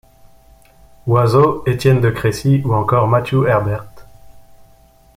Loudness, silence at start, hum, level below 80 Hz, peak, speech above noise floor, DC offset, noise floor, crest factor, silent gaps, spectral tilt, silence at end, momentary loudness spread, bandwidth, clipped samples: -15 LUFS; 1.05 s; none; -44 dBFS; 0 dBFS; 34 dB; under 0.1%; -48 dBFS; 16 dB; none; -7.5 dB/octave; 0.75 s; 5 LU; 15.5 kHz; under 0.1%